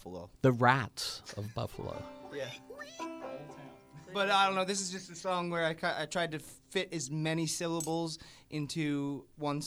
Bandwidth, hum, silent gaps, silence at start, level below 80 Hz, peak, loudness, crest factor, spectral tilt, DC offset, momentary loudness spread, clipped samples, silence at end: over 20 kHz; none; none; 0 s; -66 dBFS; -10 dBFS; -34 LUFS; 24 dB; -4.5 dB/octave; under 0.1%; 18 LU; under 0.1%; 0 s